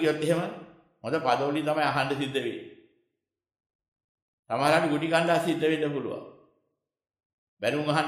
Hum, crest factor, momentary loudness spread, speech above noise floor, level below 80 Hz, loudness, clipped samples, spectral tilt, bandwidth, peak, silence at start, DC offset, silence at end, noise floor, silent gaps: none; 20 dB; 13 LU; 59 dB; -72 dBFS; -27 LUFS; under 0.1%; -5.5 dB/octave; 14 kHz; -8 dBFS; 0 s; under 0.1%; 0 s; -85 dBFS; 3.75-3.79 s, 3.88-3.96 s, 4.04-4.43 s, 7.25-7.57 s